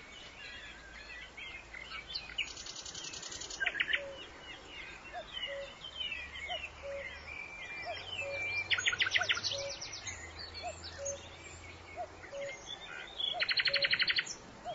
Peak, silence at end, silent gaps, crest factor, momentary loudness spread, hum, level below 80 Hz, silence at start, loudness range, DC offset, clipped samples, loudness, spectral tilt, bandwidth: -16 dBFS; 0 s; none; 24 dB; 17 LU; none; -60 dBFS; 0 s; 8 LU; under 0.1%; under 0.1%; -36 LUFS; 1 dB/octave; 7.6 kHz